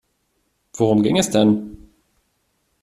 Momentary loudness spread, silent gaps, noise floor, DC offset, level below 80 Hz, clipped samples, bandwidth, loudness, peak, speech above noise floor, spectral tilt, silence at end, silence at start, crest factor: 19 LU; none; -68 dBFS; under 0.1%; -52 dBFS; under 0.1%; 14.5 kHz; -18 LUFS; -2 dBFS; 52 dB; -5.5 dB/octave; 1.05 s; 0.75 s; 18 dB